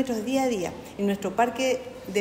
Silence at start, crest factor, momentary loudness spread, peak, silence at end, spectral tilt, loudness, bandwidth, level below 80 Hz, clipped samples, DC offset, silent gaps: 0 s; 16 dB; 6 LU; -10 dBFS; 0 s; -4.5 dB/octave; -27 LUFS; 16 kHz; -56 dBFS; under 0.1%; under 0.1%; none